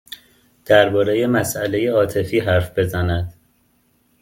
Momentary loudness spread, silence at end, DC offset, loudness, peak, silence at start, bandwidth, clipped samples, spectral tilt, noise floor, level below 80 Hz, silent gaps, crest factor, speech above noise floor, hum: 11 LU; 0.9 s; under 0.1%; -18 LUFS; 0 dBFS; 0.1 s; 17 kHz; under 0.1%; -5.5 dB/octave; -61 dBFS; -46 dBFS; none; 20 dB; 44 dB; none